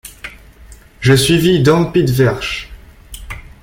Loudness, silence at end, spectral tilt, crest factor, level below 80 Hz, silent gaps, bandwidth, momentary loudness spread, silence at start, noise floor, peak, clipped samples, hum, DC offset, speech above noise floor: -13 LUFS; 0.2 s; -5.5 dB/octave; 14 dB; -36 dBFS; none; 17 kHz; 22 LU; 0.05 s; -40 dBFS; 0 dBFS; under 0.1%; none; under 0.1%; 28 dB